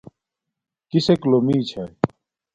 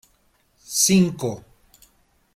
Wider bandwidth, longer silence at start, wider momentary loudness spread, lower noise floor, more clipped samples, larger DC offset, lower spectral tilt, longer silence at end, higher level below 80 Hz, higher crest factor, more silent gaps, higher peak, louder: second, 9.2 kHz vs 16 kHz; first, 0.95 s vs 0.7 s; second, 9 LU vs 14 LU; first, -83 dBFS vs -63 dBFS; neither; neither; first, -7.5 dB/octave vs -4 dB/octave; second, 0.5 s vs 0.95 s; about the same, -56 dBFS vs -56 dBFS; about the same, 22 dB vs 20 dB; neither; first, 0 dBFS vs -4 dBFS; about the same, -21 LUFS vs -20 LUFS